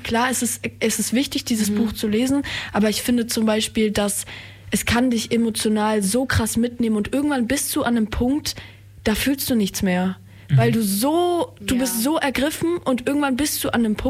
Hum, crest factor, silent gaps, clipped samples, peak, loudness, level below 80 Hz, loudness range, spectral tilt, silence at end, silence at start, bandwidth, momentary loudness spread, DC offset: none; 12 dB; none; under 0.1%; -8 dBFS; -21 LUFS; -42 dBFS; 1 LU; -4.5 dB/octave; 0 s; 0 s; 16 kHz; 5 LU; under 0.1%